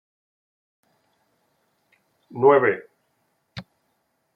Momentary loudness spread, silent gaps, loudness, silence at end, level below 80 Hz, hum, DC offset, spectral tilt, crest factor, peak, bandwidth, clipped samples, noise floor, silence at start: 25 LU; none; -19 LUFS; 0.75 s; -70 dBFS; none; under 0.1%; -8.5 dB/octave; 24 dB; -4 dBFS; 5.4 kHz; under 0.1%; -72 dBFS; 2.35 s